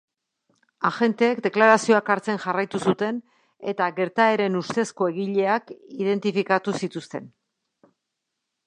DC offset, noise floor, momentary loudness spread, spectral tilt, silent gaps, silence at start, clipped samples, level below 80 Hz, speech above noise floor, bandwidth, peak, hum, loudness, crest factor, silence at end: under 0.1%; -81 dBFS; 13 LU; -5.5 dB/octave; none; 0.8 s; under 0.1%; -72 dBFS; 59 dB; 10.5 kHz; -2 dBFS; none; -23 LUFS; 22 dB; 1.4 s